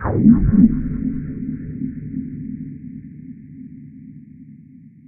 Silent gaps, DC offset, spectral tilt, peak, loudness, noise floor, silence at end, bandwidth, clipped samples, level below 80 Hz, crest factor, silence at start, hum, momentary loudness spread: none; under 0.1%; -10 dB/octave; 0 dBFS; -19 LUFS; -44 dBFS; 0.45 s; 2.4 kHz; under 0.1%; -32 dBFS; 20 dB; 0 s; none; 25 LU